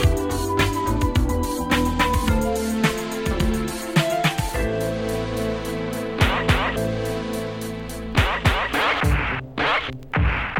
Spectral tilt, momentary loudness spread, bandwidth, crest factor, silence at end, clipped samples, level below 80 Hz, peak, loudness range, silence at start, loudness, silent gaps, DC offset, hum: -5 dB/octave; 7 LU; 17.5 kHz; 18 dB; 0 s; under 0.1%; -30 dBFS; -4 dBFS; 2 LU; 0 s; -22 LUFS; none; under 0.1%; none